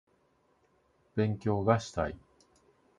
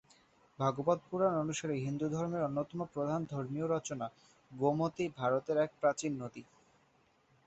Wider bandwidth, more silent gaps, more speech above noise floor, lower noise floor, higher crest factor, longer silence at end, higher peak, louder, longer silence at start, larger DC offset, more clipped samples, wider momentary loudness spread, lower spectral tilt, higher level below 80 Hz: first, 9.4 kHz vs 8 kHz; neither; first, 41 dB vs 36 dB; about the same, -70 dBFS vs -71 dBFS; about the same, 24 dB vs 20 dB; second, 0.85 s vs 1.05 s; first, -10 dBFS vs -16 dBFS; first, -31 LUFS vs -35 LUFS; first, 1.15 s vs 0.6 s; neither; neither; about the same, 10 LU vs 9 LU; about the same, -7 dB/octave vs -6.5 dB/octave; first, -54 dBFS vs -72 dBFS